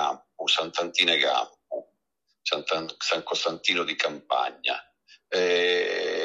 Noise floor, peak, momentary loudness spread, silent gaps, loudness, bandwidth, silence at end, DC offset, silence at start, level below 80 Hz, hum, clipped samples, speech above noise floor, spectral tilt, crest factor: -77 dBFS; -6 dBFS; 11 LU; none; -25 LUFS; 11 kHz; 0 s; under 0.1%; 0 s; -78 dBFS; none; under 0.1%; 51 dB; -1.5 dB/octave; 22 dB